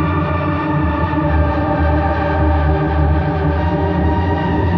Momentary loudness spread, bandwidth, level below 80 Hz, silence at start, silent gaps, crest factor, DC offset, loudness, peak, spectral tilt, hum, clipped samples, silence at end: 2 LU; 5.2 kHz; -22 dBFS; 0 s; none; 12 dB; under 0.1%; -16 LUFS; -4 dBFS; -10 dB/octave; none; under 0.1%; 0 s